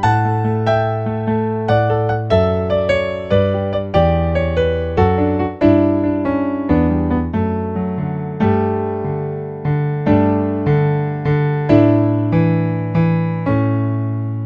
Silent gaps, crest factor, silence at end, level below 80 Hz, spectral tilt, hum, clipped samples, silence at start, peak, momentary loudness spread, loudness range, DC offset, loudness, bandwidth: none; 16 dB; 0 s; -34 dBFS; -9.5 dB/octave; none; under 0.1%; 0 s; 0 dBFS; 7 LU; 3 LU; under 0.1%; -17 LUFS; 7.6 kHz